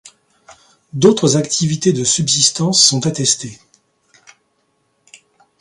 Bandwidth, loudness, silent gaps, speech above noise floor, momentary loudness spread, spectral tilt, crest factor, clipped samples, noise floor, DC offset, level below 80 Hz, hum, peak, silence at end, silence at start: 11.5 kHz; -13 LUFS; none; 49 dB; 7 LU; -3.5 dB/octave; 18 dB; under 0.1%; -64 dBFS; under 0.1%; -56 dBFS; none; 0 dBFS; 2.05 s; 0.05 s